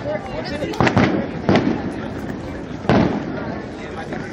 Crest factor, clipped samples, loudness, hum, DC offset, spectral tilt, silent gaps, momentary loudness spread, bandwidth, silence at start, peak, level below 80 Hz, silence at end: 20 dB; under 0.1%; -21 LUFS; none; under 0.1%; -7 dB/octave; none; 12 LU; 11 kHz; 0 s; 0 dBFS; -40 dBFS; 0 s